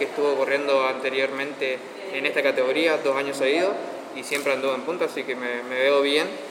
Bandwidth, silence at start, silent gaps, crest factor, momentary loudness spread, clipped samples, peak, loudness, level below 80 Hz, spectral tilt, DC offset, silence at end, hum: 16.5 kHz; 0 s; none; 16 dB; 7 LU; under 0.1%; -8 dBFS; -24 LUFS; -82 dBFS; -3 dB/octave; under 0.1%; 0 s; none